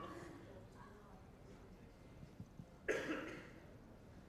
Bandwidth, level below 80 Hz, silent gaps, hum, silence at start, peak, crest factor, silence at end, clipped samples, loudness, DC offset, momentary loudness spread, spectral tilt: 15 kHz; -66 dBFS; none; none; 0 s; -28 dBFS; 24 dB; 0 s; under 0.1%; -51 LUFS; under 0.1%; 18 LU; -5 dB/octave